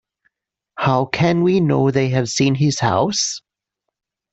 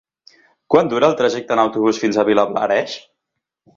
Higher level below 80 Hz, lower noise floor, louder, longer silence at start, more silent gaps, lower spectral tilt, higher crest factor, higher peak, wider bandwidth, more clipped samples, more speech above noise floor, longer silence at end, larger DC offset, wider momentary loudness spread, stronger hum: about the same, -54 dBFS vs -58 dBFS; about the same, -80 dBFS vs -79 dBFS; about the same, -17 LUFS vs -17 LUFS; about the same, 0.75 s vs 0.7 s; neither; about the same, -5 dB/octave vs -5 dB/octave; about the same, 16 dB vs 18 dB; second, -4 dBFS vs 0 dBFS; about the same, 8.2 kHz vs 7.6 kHz; neither; about the same, 63 dB vs 63 dB; first, 0.95 s vs 0.75 s; neither; about the same, 6 LU vs 4 LU; neither